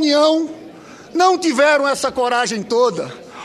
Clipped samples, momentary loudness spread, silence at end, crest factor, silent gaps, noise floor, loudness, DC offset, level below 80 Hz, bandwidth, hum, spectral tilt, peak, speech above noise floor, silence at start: under 0.1%; 14 LU; 0 s; 16 dB; none; -38 dBFS; -16 LUFS; under 0.1%; -60 dBFS; 13 kHz; none; -3 dB/octave; -2 dBFS; 23 dB; 0 s